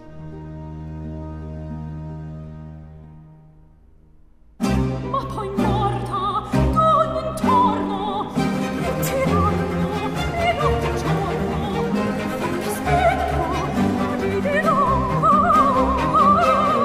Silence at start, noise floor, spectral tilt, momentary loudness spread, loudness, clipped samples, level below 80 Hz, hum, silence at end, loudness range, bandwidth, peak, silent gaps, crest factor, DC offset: 0 s; -49 dBFS; -6.5 dB/octave; 17 LU; -20 LUFS; under 0.1%; -34 dBFS; none; 0 s; 16 LU; 15.5 kHz; -6 dBFS; none; 16 dB; under 0.1%